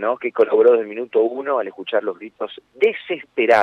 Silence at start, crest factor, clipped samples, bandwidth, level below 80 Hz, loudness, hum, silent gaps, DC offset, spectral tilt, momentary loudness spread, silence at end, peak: 0 s; 14 dB; under 0.1%; 6.4 kHz; -70 dBFS; -19 LUFS; none; none; under 0.1%; -5 dB/octave; 15 LU; 0 s; -4 dBFS